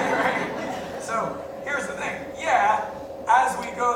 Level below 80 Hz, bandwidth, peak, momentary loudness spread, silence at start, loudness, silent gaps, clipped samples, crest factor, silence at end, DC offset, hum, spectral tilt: -58 dBFS; 17.5 kHz; -6 dBFS; 11 LU; 0 s; -25 LUFS; none; under 0.1%; 18 dB; 0 s; under 0.1%; none; -3.5 dB/octave